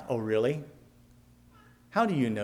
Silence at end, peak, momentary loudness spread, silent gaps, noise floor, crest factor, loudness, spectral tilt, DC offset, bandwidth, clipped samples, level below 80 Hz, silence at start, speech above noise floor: 0 s; -14 dBFS; 11 LU; none; -58 dBFS; 18 dB; -29 LUFS; -7.5 dB/octave; under 0.1%; 15 kHz; under 0.1%; -66 dBFS; 0 s; 30 dB